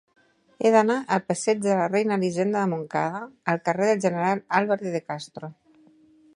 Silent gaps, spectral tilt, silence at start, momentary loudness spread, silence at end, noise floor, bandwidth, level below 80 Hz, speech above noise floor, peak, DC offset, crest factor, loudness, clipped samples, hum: none; -5.5 dB/octave; 0.6 s; 11 LU; 0.85 s; -57 dBFS; 11.5 kHz; -72 dBFS; 33 dB; -4 dBFS; under 0.1%; 20 dB; -24 LUFS; under 0.1%; none